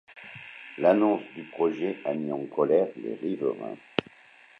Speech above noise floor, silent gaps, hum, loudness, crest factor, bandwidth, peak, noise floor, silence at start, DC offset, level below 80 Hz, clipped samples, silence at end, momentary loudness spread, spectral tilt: 28 dB; none; none; -27 LUFS; 24 dB; 6.2 kHz; -4 dBFS; -55 dBFS; 0.1 s; under 0.1%; -74 dBFS; under 0.1%; 0.6 s; 18 LU; -8 dB/octave